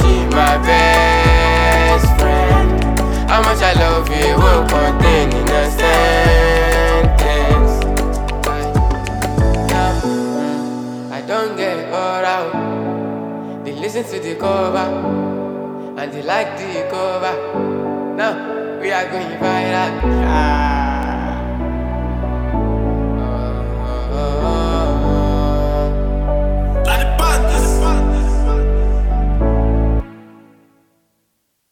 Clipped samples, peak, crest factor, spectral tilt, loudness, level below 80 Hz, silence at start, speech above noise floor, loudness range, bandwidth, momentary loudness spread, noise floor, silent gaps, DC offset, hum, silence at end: under 0.1%; 0 dBFS; 14 dB; -5.5 dB/octave; -16 LUFS; -18 dBFS; 0 s; 50 dB; 8 LU; 17.5 kHz; 10 LU; -67 dBFS; none; under 0.1%; none; 1.5 s